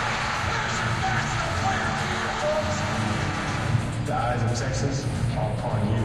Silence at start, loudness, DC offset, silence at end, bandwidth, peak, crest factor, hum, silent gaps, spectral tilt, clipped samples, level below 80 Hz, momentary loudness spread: 0 s; -26 LUFS; under 0.1%; 0 s; 12 kHz; -10 dBFS; 16 dB; none; none; -5 dB/octave; under 0.1%; -40 dBFS; 2 LU